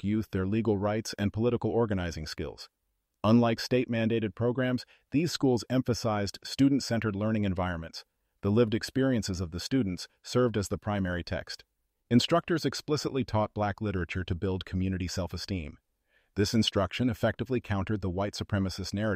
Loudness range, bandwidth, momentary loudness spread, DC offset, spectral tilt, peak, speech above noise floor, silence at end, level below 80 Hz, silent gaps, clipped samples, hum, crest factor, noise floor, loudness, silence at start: 3 LU; 15.5 kHz; 10 LU; under 0.1%; -6 dB/octave; -12 dBFS; 43 dB; 0 s; -52 dBFS; none; under 0.1%; none; 18 dB; -72 dBFS; -30 LUFS; 0.05 s